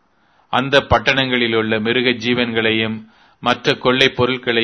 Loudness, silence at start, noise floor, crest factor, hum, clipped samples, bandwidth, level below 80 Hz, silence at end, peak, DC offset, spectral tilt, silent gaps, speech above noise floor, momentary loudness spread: -16 LUFS; 0.55 s; -58 dBFS; 18 dB; none; under 0.1%; 11 kHz; -42 dBFS; 0 s; 0 dBFS; under 0.1%; -5 dB/octave; none; 41 dB; 7 LU